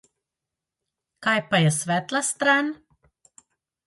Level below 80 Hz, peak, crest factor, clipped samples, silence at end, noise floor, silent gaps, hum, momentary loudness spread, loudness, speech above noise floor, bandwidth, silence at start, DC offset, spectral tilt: -68 dBFS; -8 dBFS; 20 dB; under 0.1%; 1.1 s; -87 dBFS; none; none; 9 LU; -22 LUFS; 64 dB; 12 kHz; 1.2 s; under 0.1%; -4 dB/octave